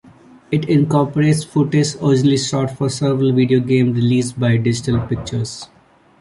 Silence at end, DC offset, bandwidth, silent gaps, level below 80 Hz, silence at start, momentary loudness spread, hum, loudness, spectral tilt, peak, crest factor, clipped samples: 0.55 s; under 0.1%; 11.5 kHz; none; -46 dBFS; 0.5 s; 8 LU; none; -17 LUFS; -6.5 dB/octave; -2 dBFS; 14 dB; under 0.1%